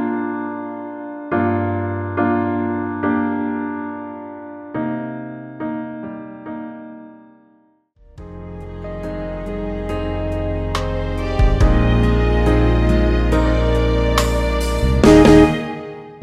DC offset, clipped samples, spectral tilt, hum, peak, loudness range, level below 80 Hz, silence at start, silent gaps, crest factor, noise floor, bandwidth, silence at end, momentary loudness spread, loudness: under 0.1%; under 0.1%; -7 dB/octave; none; 0 dBFS; 17 LU; -24 dBFS; 0 s; none; 18 dB; -56 dBFS; 13.5 kHz; 0 s; 16 LU; -18 LUFS